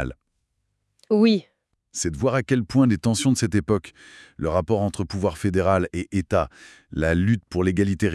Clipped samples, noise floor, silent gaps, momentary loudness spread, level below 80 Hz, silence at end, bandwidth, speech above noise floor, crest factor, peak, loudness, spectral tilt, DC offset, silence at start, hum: under 0.1%; -74 dBFS; none; 9 LU; -46 dBFS; 0 s; 12 kHz; 52 dB; 16 dB; -6 dBFS; -23 LUFS; -6 dB/octave; under 0.1%; 0 s; none